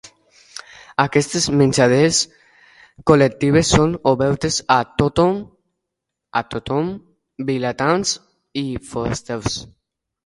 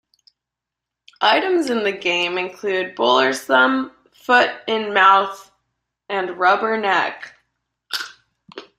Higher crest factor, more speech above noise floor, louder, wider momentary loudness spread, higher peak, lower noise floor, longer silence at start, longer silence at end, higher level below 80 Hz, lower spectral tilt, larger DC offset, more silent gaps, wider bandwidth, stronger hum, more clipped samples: about the same, 20 dB vs 20 dB; about the same, 63 dB vs 66 dB; about the same, -18 LUFS vs -18 LUFS; about the same, 14 LU vs 13 LU; about the same, 0 dBFS vs -2 dBFS; about the same, -81 dBFS vs -84 dBFS; second, 0.05 s vs 1.2 s; first, 0.6 s vs 0.15 s; first, -42 dBFS vs -68 dBFS; first, -4.5 dB/octave vs -3 dB/octave; neither; neither; second, 11.5 kHz vs 15.5 kHz; neither; neither